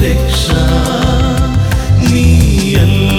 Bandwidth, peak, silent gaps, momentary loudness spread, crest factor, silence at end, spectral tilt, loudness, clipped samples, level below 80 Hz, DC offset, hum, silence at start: 17 kHz; 0 dBFS; none; 4 LU; 10 dB; 0 s; -5.5 dB/octave; -11 LUFS; under 0.1%; -14 dBFS; under 0.1%; none; 0 s